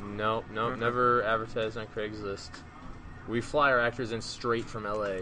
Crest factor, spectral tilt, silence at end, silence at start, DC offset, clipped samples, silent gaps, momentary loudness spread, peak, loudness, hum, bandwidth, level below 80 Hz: 18 dB; -5 dB/octave; 0 s; 0 s; under 0.1%; under 0.1%; none; 20 LU; -14 dBFS; -30 LUFS; none; 10 kHz; -50 dBFS